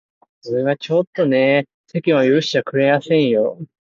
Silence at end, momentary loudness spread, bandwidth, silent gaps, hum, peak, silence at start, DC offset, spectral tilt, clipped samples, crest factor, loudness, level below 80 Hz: 0.25 s; 8 LU; 7.6 kHz; 1.07-1.13 s, 1.74-1.84 s; none; -2 dBFS; 0.45 s; under 0.1%; -6.5 dB/octave; under 0.1%; 16 dB; -17 LUFS; -64 dBFS